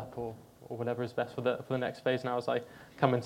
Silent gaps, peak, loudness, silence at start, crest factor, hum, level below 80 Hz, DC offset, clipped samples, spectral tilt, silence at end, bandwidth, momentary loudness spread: none; -10 dBFS; -34 LUFS; 0 s; 22 dB; none; -70 dBFS; under 0.1%; under 0.1%; -7 dB/octave; 0 s; 16.5 kHz; 11 LU